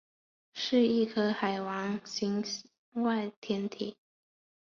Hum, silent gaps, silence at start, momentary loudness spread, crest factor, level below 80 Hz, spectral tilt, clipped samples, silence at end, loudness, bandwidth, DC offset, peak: none; 2.78-2.92 s, 3.36-3.42 s; 0.55 s; 13 LU; 18 dB; -74 dBFS; -5 dB/octave; under 0.1%; 0.75 s; -32 LUFS; 7.4 kHz; under 0.1%; -16 dBFS